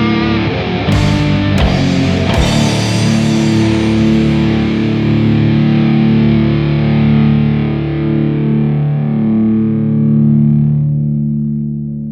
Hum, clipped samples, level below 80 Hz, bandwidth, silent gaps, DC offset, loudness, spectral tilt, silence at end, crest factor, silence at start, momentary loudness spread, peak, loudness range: none; under 0.1%; -28 dBFS; 11 kHz; none; under 0.1%; -12 LUFS; -7 dB/octave; 0 s; 12 dB; 0 s; 5 LU; 0 dBFS; 1 LU